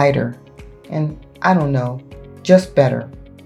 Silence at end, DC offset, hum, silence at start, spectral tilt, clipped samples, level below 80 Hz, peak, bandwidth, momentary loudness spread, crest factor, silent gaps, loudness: 0.25 s; under 0.1%; none; 0 s; -7.5 dB/octave; under 0.1%; -44 dBFS; 0 dBFS; 11.5 kHz; 16 LU; 18 dB; none; -18 LUFS